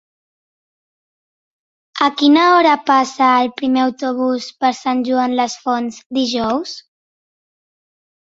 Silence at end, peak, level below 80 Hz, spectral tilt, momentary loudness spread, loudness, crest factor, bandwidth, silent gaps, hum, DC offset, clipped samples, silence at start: 1.5 s; -2 dBFS; -60 dBFS; -3 dB/octave; 10 LU; -16 LUFS; 16 dB; 7.8 kHz; 6.06-6.10 s; none; under 0.1%; under 0.1%; 1.95 s